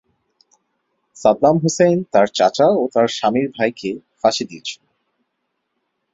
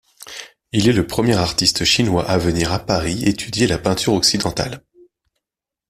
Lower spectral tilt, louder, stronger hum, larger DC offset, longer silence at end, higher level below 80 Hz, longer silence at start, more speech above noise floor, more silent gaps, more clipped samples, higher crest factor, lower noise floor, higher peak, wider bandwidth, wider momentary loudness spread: about the same, -5 dB/octave vs -4 dB/octave; about the same, -17 LUFS vs -17 LUFS; neither; neither; first, 1.4 s vs 1.1 s; second, -60 dBFS vs -40 dBFS; first, 1.2 s vs 0.2 s; second, 57 dB vs 69 dB; neither; neither; about the same, 18 dB vs 18 dB; second, -74 dBFS vs -87 dBFS; about the same, -2 dBFS vs -2 dBFS; second, 8 kHz vs 15.5 kHz; about the same, 13 LU vs 14 LU